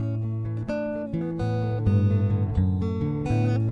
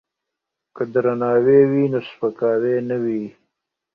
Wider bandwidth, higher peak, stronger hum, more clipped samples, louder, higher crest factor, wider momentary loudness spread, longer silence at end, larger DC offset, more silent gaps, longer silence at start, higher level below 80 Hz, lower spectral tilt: first, 6 kHz vs 5 kHz; second, -12 dBFS vs -2 dBFS; neither; neither; second, -26 LUFS vs -19 LUFS; second, 12 dB vs 18 dB; second, 7 LU vs 12 LU; second, 0 s vs 0.65 s; neither; neither; second, 0 s vs 0.75 s; first, -42 dBFS vs -62 dBFS; about the same, -9.5 dB/octave vs -10 dB/octave